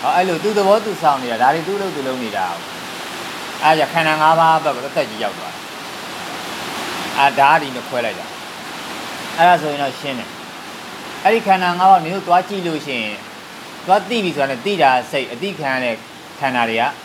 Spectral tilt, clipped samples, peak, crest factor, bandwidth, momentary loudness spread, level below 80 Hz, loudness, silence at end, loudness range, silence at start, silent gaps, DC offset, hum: -4 dB/octave; under 0.1%; 0 dBFS; 18 dB; 16.5 kHz; 16 LU; -66 dBFS; -17 LUFS; 0 s; 2 LU; 0 s; none; under 0.1%; none